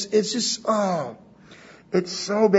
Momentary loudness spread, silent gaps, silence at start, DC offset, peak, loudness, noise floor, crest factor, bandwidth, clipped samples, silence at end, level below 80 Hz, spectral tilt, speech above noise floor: 6 LU; none; 0 s; under 0.1%; -4 dBFS; -24 LUFS; -48 dBFS; 20 dB; 8 kHz; under 0.1%; 0 s; -68 dBFS; -4 dB/octave; 26 dB